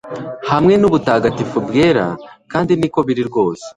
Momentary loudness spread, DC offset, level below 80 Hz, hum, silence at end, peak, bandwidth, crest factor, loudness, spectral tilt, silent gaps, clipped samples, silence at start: 11 LU; under 0.1%; -46 dBFS; none; 0.05 s; 0 dBFS; 11 kHz; 14 dB; -15 LUFS; -7 dB/octave; none; under 0.1%; 0.05 s